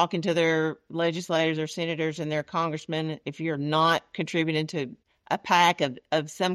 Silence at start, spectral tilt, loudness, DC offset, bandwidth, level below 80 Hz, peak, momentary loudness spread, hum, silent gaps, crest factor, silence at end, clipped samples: 0 s; -5 dB/octave; -26 LUFS; under 0.1%; 14 kHz; -70 dBFS; -8 dBFS; 9 LU; none; none; 18 dB; 0 s; under 0.1%